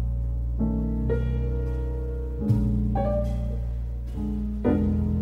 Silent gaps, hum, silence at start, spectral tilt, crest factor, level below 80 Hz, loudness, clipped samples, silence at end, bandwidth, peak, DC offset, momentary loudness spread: none; none; 0 s; -10.5 dB/octave; 16 dB; -28 dBFS; -27 LUFS; under 0.1%; 0 s; 4 kHz; -10 dBFS; under 0.1%; 7 LU